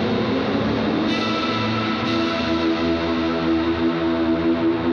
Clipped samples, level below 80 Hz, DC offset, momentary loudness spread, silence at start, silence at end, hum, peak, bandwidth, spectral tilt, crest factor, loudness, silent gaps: under 0.1%; -44 dBFS; under 0.1%; 1 LU; 0 s; 0 s; none; -8 dBFS; 6.8 kHz; -6.5 dB/octave; 12 dB; -21 LUFS; none